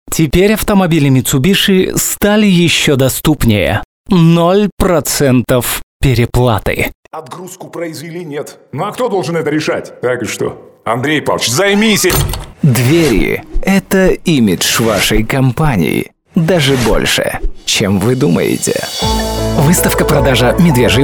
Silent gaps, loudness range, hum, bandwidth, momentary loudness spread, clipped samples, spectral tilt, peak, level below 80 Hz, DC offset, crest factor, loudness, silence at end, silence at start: 3.85-4.05 s, 4.72-4.77 s, 5.83-6.00 s, 6.95-7.03 s; 7 LU; none; 19.5 kHz; 10 LU; under 0.1%; -5 dB/octave; 0 dBFS; -26 dBFS; under 0.1%; 12 dB; -12 LUFS; 0 s; 0.05 s